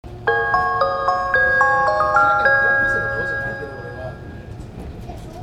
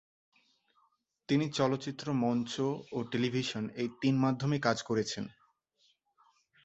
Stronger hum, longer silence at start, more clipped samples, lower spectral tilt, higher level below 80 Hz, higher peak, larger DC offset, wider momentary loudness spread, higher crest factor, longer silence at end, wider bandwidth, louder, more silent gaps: neither; second, 0.05 s vs 1.3 s; neither; about the same, -5.5 dB/octave vs -6 dB/octave; first, -40 dBFS vs -70 dBFS; first, -4 dBFS vs -12 dBFS; neither; first, 20 LU vs 7 LU; second, 16 dB vs 22 dB; second, 0 s vs 1.35 s; first, 12 kHz vs 8.2 kHz; first, -17 LUFS vs -33 LUFS; neither